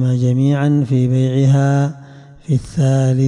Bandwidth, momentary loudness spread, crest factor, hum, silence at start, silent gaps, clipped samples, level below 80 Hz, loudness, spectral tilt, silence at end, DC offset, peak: 10 kHz; 7 LU; 10 dB; none; 0 s; none; under 0.1%; -46 dBFS; -15 LUFS; -8 dB/octave; 0 s; under 0.1%; -6 dBFS